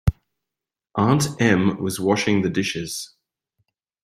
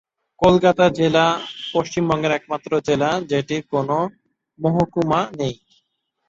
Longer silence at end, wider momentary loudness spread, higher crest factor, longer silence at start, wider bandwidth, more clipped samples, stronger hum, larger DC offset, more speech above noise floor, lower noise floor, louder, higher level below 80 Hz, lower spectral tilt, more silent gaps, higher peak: first, 1 s vs 0.75 s; first, 12 LU vs 9 LU; about the same, 20 dB vs 18 dB; second, 0.05 s vs 0.4 s; first, 16 kHz vs 7.8 kHz; neither; neither; neither; first, 67 dB vs 52 dB; first, -87 dBFS vs -71 dBFS; about the same, -21 LUFS vs -20 LUFS; first, -40 dBFS vs -50 dBFS; about the same, -5.5 dB/octave vs -6 dB/octave; neither; about the same, -2 dBFS vs -2 dBFS